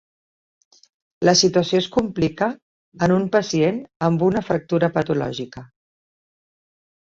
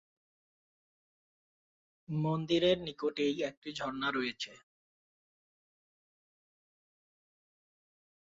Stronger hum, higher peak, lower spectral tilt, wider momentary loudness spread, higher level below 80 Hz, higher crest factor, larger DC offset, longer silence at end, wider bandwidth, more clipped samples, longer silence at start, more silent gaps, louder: neither; first, -2 dBFS vs -18 dBFS; about the same, -5 dB/octave vs -4 dB/octave; about the same, 10 LU vs 11 LU; first, -54 dBFS vs -70 dBFS; about the same, 20 dB vs 22 dB; neither; second, 1.35 s vs 3.7 s; about the same, 7.8 kHz vs 7.6 kHz; neither; second, 1.2 s vs 2.1 s; first, 2.62-2.92 s, 3.96-4.00 s vs 3.57-3.62 s; first, -20 LUFS vs -34 LUFS